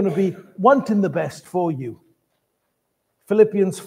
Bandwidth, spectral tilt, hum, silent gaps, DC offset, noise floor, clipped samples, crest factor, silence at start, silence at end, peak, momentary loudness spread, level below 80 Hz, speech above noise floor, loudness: 15.5 kHz; -7.5 dB/octave; none; none; under 0.1%; -73 dBFS; under 0.1%; 18 dB; 0 s; 0 s; -2 dBFS; 10 LU; -70 dBFS; 54 dB; -20 LUFS